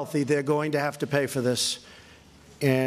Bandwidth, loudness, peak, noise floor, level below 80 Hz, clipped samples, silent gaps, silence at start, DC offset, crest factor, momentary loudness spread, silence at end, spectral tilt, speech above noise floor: 15 kHz; -26 LUFS; -8 dBFS; -52 dBFS; -64 dBFS; under 0.1%; none; 0 s; under 0.1%; 18 dB; 3 LU; 0 s; -4.5 dB/octave; 25 dB